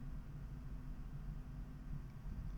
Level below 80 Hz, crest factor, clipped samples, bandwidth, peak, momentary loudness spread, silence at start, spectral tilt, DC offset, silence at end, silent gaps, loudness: -48 dBFS; 12 dB; under 0.1%; 19 kHz; -36 dBFS; 1 LU; 0 s; -8 dB/octave; under 0.1%; 0 s; none; -51 LUFS